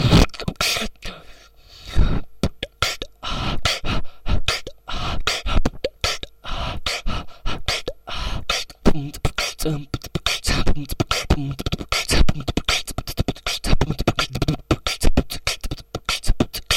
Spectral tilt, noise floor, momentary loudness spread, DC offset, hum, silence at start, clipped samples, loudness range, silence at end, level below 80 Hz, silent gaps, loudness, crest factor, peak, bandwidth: -4 dB/octave; -46 dBFS; 9 LU; under 0.1%; none; 0 s; under 0.1%; 3 LU; 0 s; -26 dBFS; none; -23 LUFS; 16 dB; -4 dBFS; 16 kHz